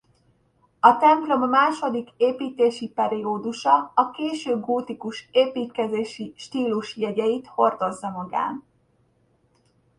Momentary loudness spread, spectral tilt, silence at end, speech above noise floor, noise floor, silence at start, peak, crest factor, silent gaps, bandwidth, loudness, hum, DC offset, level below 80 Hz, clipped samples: 10 LU; -5 dB/octave; 1.4 s; 42 dB; -64 dBFS; 0.85 s; 0 dBFS; 24 dB; none; 11 kHz; -23 LUFS; none; under 0.1%; -70 dBFS; under 0.1%